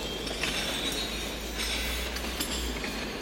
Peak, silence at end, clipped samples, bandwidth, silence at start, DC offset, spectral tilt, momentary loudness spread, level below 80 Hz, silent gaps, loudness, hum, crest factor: -16 dBFS; 0 s; under 0.1%; 16.5 kHz; 0 s; under 0.1%; -2.5 dB/octave; 4 LU; -40 dBFS; none; -31 LUFS; none; 16 dB